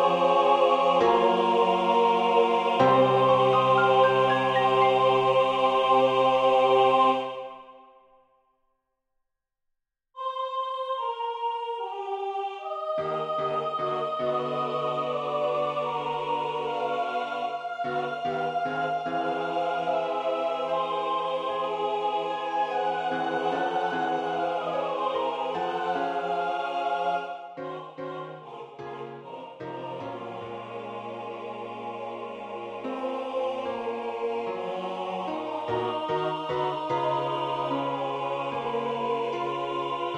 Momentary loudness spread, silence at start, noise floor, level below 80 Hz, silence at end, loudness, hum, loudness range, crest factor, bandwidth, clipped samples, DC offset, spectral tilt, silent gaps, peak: 16 LU; 0 s; -81 dBFS; -70 dBFS; 0 s; -26 LUFS; none; 15 LU; 18 dB; 9.8 kHz; under 0.1%; under 0.1%; -6 dB/octave; none; -8 dBFS